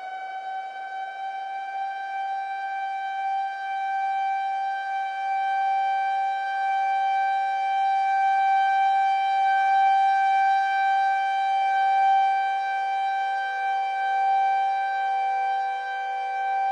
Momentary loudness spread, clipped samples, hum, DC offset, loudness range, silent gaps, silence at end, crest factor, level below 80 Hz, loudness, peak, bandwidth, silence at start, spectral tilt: 10 LU; under 0.1%; none; under 0.1%; 7 LU; none; 0 s; 10 dB; under -90 dBFS; -24 LUFS; -14 dBFS; 8.2 kHz; 0 s; 2.5 dB/octave